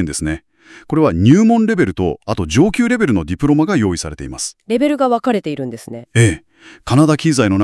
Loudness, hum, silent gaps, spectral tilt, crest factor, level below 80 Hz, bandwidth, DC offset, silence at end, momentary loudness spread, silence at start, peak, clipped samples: -15 LUFS; none; none; -6 dB/octave; 14 dB; -40 dBFS; 12 kHz; under 0.1%; 0 s; 13 LU; 0 s; 0 dBFS; under 0.1%